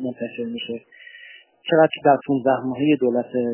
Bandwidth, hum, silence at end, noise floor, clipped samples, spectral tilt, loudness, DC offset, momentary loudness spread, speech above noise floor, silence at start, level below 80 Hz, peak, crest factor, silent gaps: 3.2 kHz; none; 0 s; -46 dBFS; under 0.1%; -10 dB/octave; -21 LUFS; under 0.1%; 18 LU; 25 dB; 0 s; -68 dBFS; -4 dBFS; 18 dB; none